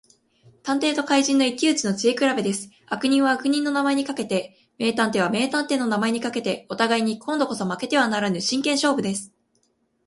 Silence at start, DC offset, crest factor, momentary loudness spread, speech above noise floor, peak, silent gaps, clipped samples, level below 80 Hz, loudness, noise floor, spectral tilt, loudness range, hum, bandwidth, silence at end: 0.65 s; under 0.1%; 18 dB; 7 LU; 46 dB; -4 dBFS; none; under 0.1%; -68 dBFS; -22 LUFS; -68 dBFS; -3.5 dB/octave; 2 LU; none; 11.5 kHz; 0.8 s